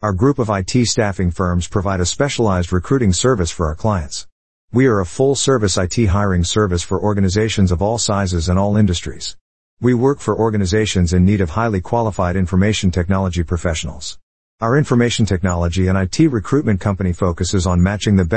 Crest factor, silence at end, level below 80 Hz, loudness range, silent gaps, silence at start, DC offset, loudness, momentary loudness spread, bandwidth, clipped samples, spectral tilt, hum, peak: 14 dB; 0 s; -36 dBFS; 2 LU; 4.32-4.68 s, 9.41-9.77 s, 14.23-14.58 s; 0 s; 1%; -17 LUFS; 5 LU; 8.8 kHz; under 0.1%; -5.5 dB/octave; none; -2 dBFS